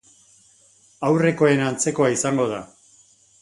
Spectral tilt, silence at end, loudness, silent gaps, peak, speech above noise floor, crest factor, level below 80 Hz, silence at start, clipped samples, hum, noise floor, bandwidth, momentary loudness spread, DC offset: -5 dB/octave; 0.75 s; -20 LUFS; none; -4 dBFS; 36 dB; 18 dB; -62 dBFS; 1 s; under 0.1%; none; -56 dBFS; 11.5 kHz; 9 LU; under 0.1%